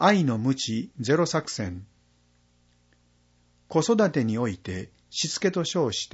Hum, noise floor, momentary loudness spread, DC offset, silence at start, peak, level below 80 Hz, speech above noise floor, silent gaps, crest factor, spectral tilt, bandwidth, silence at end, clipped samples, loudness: 60 Hz at -55 dBFS; -64 dBFS; 12 LU; under 0.1%; 0 s; -6 dBFS; -60 dBFS; 39 dB; none; 22 dB; -5 dB/octave; 8 kHz; 0 s; under 0.1%; -26 LUFS